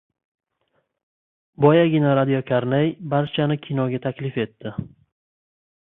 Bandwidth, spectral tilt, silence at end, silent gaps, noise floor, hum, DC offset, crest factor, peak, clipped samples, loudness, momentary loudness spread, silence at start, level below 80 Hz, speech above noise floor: 4 kHz; -11.5 dB/octave; 1.05 s; none; -71 dBFS; none; under 0.1%; 20 dB; -2 dBFS; under 0.1%; -21 LUFS; 12 LU; 1.6 s; -60 dBFS; 50 dB